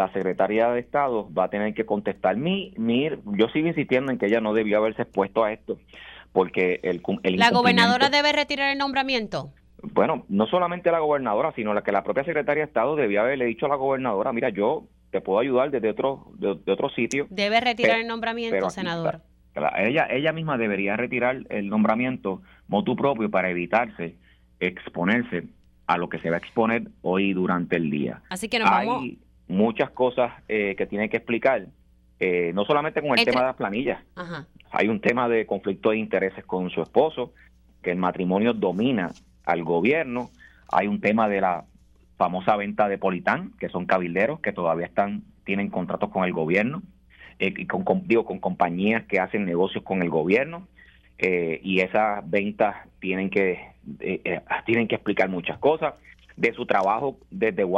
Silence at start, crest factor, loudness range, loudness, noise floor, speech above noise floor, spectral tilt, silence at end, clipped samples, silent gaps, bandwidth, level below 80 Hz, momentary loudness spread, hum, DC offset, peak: 0 s; 22 dB; 4 LU; -24 LUFS; -55 dBFS; 31 dB; -6 dB/octave; 0 s; under 0.1%; none; 12.5 kHz; -58 dBFS; 8 LU; none; under 0.1%; -2 dBFS